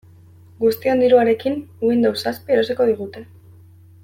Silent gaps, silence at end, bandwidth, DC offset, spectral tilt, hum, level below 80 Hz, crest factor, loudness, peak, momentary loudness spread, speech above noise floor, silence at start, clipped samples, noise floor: none; 0.8 s; 16.5 kHz; under 0.1%; -6 dB/octave; none; -62 dBFS; 16 dB; -18 LUFS; -2 dBFS; 11 LU; 28 dB; 0.6 s; under 0.1%; -46 dBFS